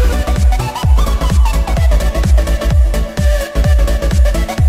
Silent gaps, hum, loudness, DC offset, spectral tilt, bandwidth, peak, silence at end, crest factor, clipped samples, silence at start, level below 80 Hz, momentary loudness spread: none; none; -14 LUFS; under 0.1%; -6 dB/octave; 15.5 kHz; -2 dBFS; 0 s; 10 dB; under 0.1%; 0 s; -12 dBFS; 2 LU